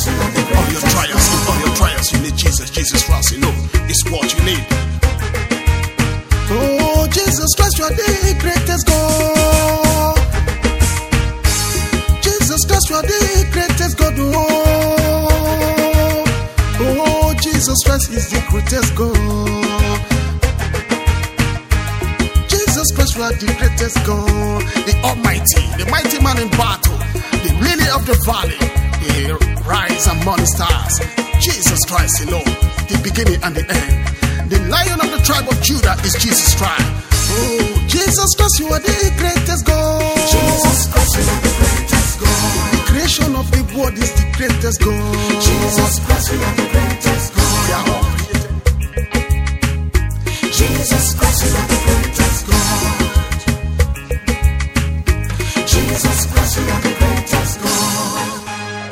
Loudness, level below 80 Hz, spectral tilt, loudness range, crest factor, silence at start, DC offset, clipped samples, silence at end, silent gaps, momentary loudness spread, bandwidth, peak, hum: -15 LUFS; -18 dBFS; -4 dB/octave; 3 LU; 14 dB; 0 s; under 0.1%; under 0.1%; 0 s; none; 5 LU; 17 kHz; 0 dBFS; none